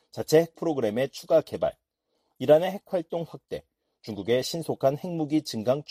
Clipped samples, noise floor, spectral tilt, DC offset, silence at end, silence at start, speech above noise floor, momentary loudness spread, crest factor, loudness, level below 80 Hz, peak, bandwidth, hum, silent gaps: under 0.1%; -76 dBFS; -5.5 dB/octave; under 0.1%; 0.1 s; 0.15 s; 50 dB; 15 LU; 20 dB; -26 LUFS; -64 dBFS; -8 dBFS; 15.5 kHz; none; none